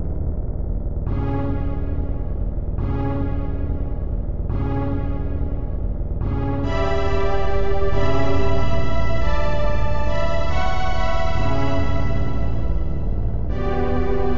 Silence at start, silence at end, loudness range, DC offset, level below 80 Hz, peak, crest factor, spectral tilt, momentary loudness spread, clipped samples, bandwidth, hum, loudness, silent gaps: 0 s; 0 s; 3 LU; 7%; -24 dBFS; -4 dBFS; 14 dB; -7.5 dB/octave; 5 LU; under 0.1%; 7.4 kHz; none; -24 LUFS; none